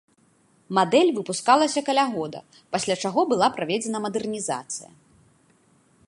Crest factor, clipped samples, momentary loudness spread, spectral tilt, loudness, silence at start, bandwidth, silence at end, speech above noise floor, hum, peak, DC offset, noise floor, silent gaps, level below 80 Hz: 22 dB; under 0.1%; 12 LU; -3.5 dB/octave; -23 LUFS; 0.7 s; 11.5 kHz; 1.2 s; 38 dB; none; -2 dBFS; under 0.1%; -62 dBFS; none; -68 dBFS